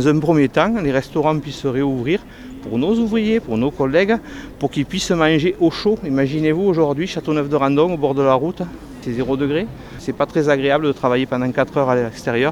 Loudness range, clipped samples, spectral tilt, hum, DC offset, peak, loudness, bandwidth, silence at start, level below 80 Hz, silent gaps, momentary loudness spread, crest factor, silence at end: 2 LU; under 0.1%; -6.5 dB/octave; none; under 0.1%; -2 dBFS; -18 LUFS; 14 kHz; 0 s; -44 dBFS; none; 9 LU; 16 dB; 0 s